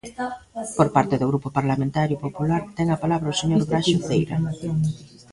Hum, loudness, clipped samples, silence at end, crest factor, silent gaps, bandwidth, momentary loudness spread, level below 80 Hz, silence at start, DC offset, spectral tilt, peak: none; -23 LUFS; under 0.1%; 0.25 s; 18 dB; none; 11.5 kHz; 10 LU; -50 dBFS; 0.05 s; under 0.1%; -6 dB/octave; -4 dBFS